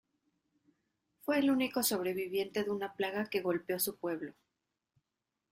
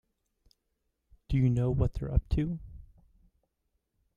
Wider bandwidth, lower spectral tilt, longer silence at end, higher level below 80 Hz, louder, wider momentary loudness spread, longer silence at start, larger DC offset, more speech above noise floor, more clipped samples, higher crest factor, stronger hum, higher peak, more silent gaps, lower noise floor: first, 16 kHz vs 7.2 kHz; second, -3.5 dB/octave vs -9.5 dB/octave; second, 1.2 s vs 1.35 s; second, -78 dBFS vs -38 dBFS; second, -34 LUFS vs -30 LUFS; about the same, 9 LU vs 11 LU; about the same, 1.25 s vs 1.3 s; neither; about the same, 54 dB vs 52 dB; neither; about the same, 18 dB vs 20 dB; neither; second, -18 dBFS vs -12 dBFS; neither; first, -88 dBFS vs -80 dBFS